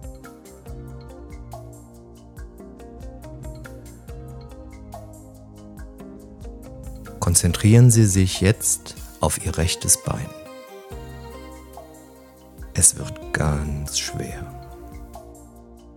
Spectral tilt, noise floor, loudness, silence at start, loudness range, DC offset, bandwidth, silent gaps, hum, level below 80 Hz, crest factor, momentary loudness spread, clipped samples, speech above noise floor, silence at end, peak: -4.5 dB/octave; -46 dBFS; -19 LUFS; 0 s; 22 LU; under 0.1%; 17 kHz; none; none; -38 dBFS; 24 dB; 26 LU; under 0.1%; 27 dB; 0.35 s; 0 dBFS